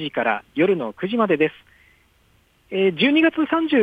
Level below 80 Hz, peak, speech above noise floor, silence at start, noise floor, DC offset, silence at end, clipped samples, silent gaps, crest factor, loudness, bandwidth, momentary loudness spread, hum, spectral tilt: -64 dBFS; -6 dBFS; 40 dB; 0 s; -59 dBFS; under 0.1%; 0 s; under 0.1%; none; 16 dB; -20 LUFS; 4.9 kHz; 7 LU; none; -7.5 dB/octave